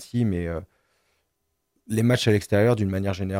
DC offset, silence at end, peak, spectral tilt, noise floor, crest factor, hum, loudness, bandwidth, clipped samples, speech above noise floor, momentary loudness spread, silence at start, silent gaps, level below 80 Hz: under 0.1%; 0 s; -6 dBFS; -6.5 dB/octave; -76 dBFS; 18 dB; none; -23 LUFS; 16.5 kHz; under 0.1%; 54 dB; 9 LU; 0 s; none; -54 dBFS